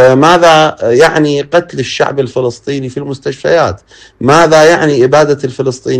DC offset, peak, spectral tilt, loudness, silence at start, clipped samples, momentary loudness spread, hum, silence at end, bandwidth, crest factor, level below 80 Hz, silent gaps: under 0.1%; 0 dBFS; -5 dB/octave; -9 LUFS; 0 s; 0.6%; 13 LU; none; 0 s; 14 kHz; 8 dB; -44 dBFS; none